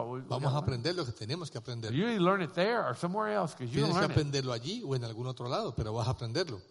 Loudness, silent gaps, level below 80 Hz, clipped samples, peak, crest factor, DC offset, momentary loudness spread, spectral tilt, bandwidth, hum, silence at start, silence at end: -33 LUFS; none; -56 dBFS; under 0.1%; -14 dBFS; 18 dB; under 0.1%; 9 LU; -6 dB/octave; 11.5 kHz; none; 0 s; 0.05 s